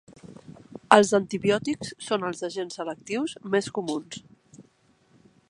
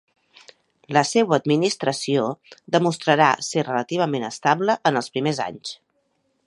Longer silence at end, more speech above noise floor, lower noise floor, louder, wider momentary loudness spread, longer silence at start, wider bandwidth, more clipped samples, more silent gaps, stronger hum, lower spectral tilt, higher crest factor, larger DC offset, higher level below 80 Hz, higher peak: first, 0.9 s vs 0.7 s; second, 37 dB vs 48 dB; second, -63 dBFS vs -69 dBFS; second, -25 LUFS vs -21 LUFS; first, 23 LU vs 10 LU; second, 0.1 s vs 0.9 s; about the same, 11.5 kHz vs 11.5 kHz; neither; neither; neither; about the same, -4.5 dB/octave vs -4.5 dB/octave; first, 26 dB vs 20 dB; neither; about the same, -66 dBFS vs -70 dBFS; about the same, 0 dBFS vs -2 dBFS